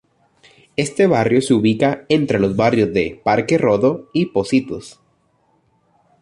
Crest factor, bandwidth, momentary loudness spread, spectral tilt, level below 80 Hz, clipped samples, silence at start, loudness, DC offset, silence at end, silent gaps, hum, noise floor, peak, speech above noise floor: 16 dB; 11.5 kHz; 7 LU; -6 dB/octave; -50 dBFS; under 0.1%; 0.8 s; -17 LUFS; under 0.1%; 1.3 s; none; none; -61 dBFS; -2 dBFS; 45 dB